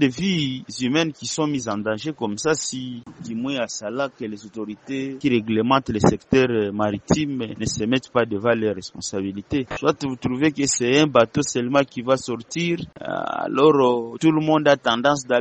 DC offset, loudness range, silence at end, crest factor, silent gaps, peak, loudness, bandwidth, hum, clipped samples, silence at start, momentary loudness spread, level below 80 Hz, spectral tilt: under 0.1%; 5 LU; 0 s; 20 dB; none; 0 dBFS; -22 LUFS; 8.8 kHz; none; under 0.1%; 0 s; 11 LU; -52 dBFS; -4.5 dB/octave